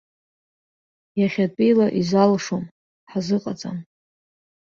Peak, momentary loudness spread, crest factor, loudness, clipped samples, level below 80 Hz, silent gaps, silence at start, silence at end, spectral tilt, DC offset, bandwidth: -4 dBFS; 14 LU; 18 dB; -21 LUFS; under 0.1%; -62 dBFS; 2.71-3.07 s; 1.15 s; 0.9 s; -6.5 dB/octave; under 0.1%; 7.4 kHz